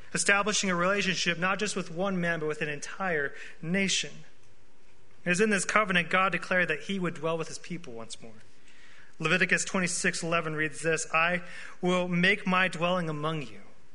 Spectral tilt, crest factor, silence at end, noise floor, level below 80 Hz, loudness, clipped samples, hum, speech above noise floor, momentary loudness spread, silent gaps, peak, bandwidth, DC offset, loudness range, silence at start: -3.5 dB/octave; 24 dB; 0.3 s; -62 dBFS; -62 dBFS; -28 LUFS; under 0.1%; none; 33 dB; 13 LU; none; -4 dBFS; 11 kHz; 1%; 4 LU; 0.1 s